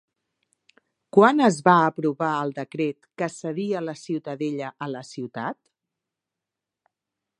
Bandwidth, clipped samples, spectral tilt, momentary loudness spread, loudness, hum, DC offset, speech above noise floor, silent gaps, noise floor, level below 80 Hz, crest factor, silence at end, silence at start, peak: 11 kHz; under 0.1%; -6 dB/octave; 16 LU; -24 LUFS; none; under 0.1%; 64 dB; none; -87 dBFS; -76 dBFS; 24 dB; 1.85 s; 1.15 s; -2 dBFS